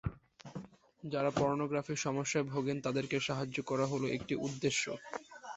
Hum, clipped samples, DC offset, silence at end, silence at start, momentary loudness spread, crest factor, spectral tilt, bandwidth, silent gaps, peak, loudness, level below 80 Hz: none; under 0.1%; under 0.1%; 0 s; 0.05 s; 16 LU; 20 dB; -4.5 dB/octave; 8.2 kHz; none; -16 dBFS; -35 LUFS; -60 dBFS